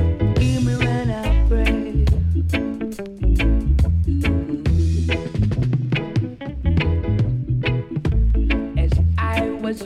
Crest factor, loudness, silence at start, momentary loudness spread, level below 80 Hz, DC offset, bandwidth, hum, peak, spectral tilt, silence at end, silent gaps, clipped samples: 12 dB; -21 LUFS; 0 s; 5 LU; -22 dBFS; under 0.1%; 11.5 kHz; none; -6 dBFS; -7.5 dB/octave; 0 s; none; under 0.1%